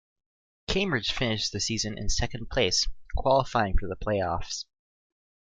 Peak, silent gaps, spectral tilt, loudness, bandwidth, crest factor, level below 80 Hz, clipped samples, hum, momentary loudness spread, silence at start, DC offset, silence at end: -10 dBFS; none; -3.5 dB/octave; -28 LUFS; 9.4 kHz; 18 dB; -36 dBFS; under 0.1%; none; 8 LU; 0.7 s; under 0.1%; 0.8 s